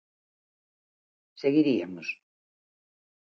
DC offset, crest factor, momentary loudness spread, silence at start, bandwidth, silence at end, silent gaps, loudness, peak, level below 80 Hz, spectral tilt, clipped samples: under 0.1%; 20 dB; 13 LU; 1.4 s; 6.4 kHz; 1.1 s; none; -27 LUFS; -12 dBFS; -80 dBFS; -7 dB/octave; under 0.1%